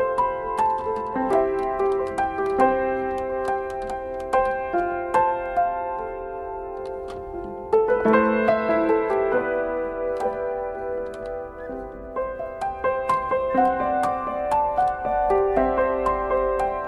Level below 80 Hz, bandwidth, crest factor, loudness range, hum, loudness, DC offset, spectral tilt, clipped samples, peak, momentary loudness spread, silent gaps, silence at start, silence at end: -46 dBFS; 11.5 kHz; 18 dB; 5 LU; none; -24 LUFS; under 0.1%; -6.5 dB/octave; under 0.1%; -6 dBFS; 12 LU; none; 0 s; 0 s